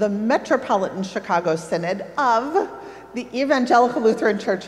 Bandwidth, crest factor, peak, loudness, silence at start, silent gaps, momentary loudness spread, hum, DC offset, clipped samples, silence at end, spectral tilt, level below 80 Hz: 13 kHz; 16 dB; -4 dBFS; -21 LUFS; 0 s; none; 12 LU; none; under 0.1%; under 0.1%; 0 s; -5.5 dB/octave; -62 dBFS